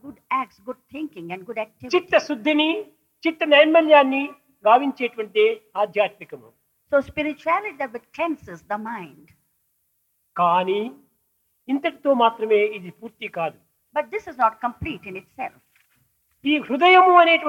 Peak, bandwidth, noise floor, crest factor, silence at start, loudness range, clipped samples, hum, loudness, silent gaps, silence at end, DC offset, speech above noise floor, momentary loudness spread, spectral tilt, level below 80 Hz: -2 dBFS; 15.5 kHz; -70 dBFS; 20 dB; 0.05 s; 9 LU; under 0.1%; none; -20 LUFS; none; 0 s; under 0.1%; 49 dB; 20 LU; -5 dB/octave; -62 dBFS